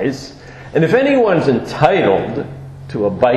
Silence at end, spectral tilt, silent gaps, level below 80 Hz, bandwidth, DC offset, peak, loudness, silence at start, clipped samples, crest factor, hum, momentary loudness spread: 0 s; -7 dB/octave; none; -46 dBFS; 12 kHz; under 0.1%; 0 dBFS; -15 LUFS; 0 s; under 0.1%; 14 dB; none; 17 LU